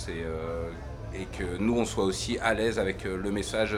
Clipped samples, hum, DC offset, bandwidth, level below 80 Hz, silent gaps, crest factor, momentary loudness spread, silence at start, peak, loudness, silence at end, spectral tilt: under 0.1%; none; under 0.1%; 16 kHz; -42 dBFS; none; 20 dB; 11 LU; 0 s; -10 dBFS; -30 LUFS; 0 s; -5 dB/octave